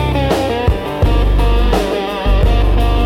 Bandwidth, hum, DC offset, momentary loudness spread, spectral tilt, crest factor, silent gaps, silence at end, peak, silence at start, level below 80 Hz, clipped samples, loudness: 13.5 kHz; none; under 0.1%; 3 LU; -6.5 dB/octave; 10 dB; none; 0 s; -2 dBFS; 0 s; -14 dBFS; under 0.1%; -15 LUFS